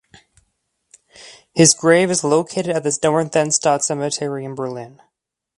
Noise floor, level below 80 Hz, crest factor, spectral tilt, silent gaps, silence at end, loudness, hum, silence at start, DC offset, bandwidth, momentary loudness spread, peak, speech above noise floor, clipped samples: -77 dBFS; -60 dBFS; 20 dB; -3.5 dB/octave; none; 0.7 s; -17 LUFS; none; 1.2 s; under 0.1%; 11.5 kHz; 14 LU; 0 dBFS; 59 dB; under 0.1%